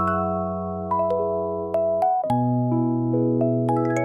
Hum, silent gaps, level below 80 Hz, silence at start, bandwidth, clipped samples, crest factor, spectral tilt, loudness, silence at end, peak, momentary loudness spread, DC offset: none; none; -60 dBFS; 0 s; 11 kHz; under 0.1%; 12 dB; -9.5 dB/octave; -23 LUFS; 0 s; -10 dBFS; 5 LU; under 0.1%